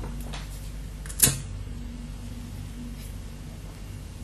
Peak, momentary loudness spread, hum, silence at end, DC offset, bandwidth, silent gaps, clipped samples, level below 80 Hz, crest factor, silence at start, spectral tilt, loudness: -2 dBFS; 19 LU; none; 0 s; under 0.1%; 13.5 kHz; none; under 0.1%; -38 dBFS; 30 dB; 0 s; -2.5 dB/octave; -30 LUFS